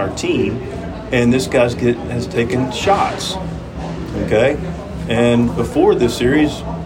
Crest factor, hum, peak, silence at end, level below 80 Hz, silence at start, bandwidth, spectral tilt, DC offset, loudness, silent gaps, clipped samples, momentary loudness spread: 14 dB; none; -2 dBFS; 0 s; -34 dBFS; 0 s; 16.5 kHz; -6 dB/octave; under 0.1%; -17 LUFS; none; under 0.1%; 12 LU